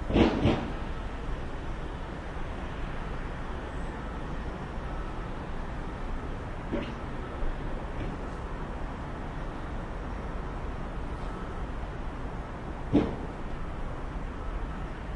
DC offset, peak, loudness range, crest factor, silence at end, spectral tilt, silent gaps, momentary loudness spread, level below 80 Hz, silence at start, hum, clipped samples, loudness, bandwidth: under 0.1%; -8 dBFS; 3 LU; 24 dB; 0 s; -7.5 dB/octave; none; 10 LU; -36 dBFS; 0 s; none; under 0.1%; -35 LUFS; 10.5 kHz